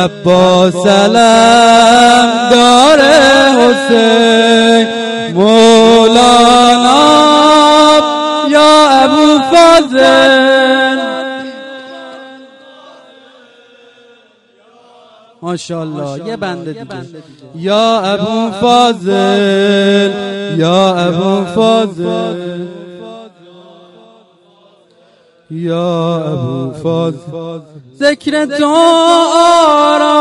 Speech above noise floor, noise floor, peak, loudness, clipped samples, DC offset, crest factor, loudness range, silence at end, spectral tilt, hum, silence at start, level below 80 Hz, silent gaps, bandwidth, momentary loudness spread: 40 dB; -48 dBFS; 0 dBFS; -8 LUFS; 0.7%; under 0.1%; 10 dB; 18 LU; 0 s; -4 dB/octave; none; 0 s; -46 dBFS; none; 11.5 kHz; 17 LU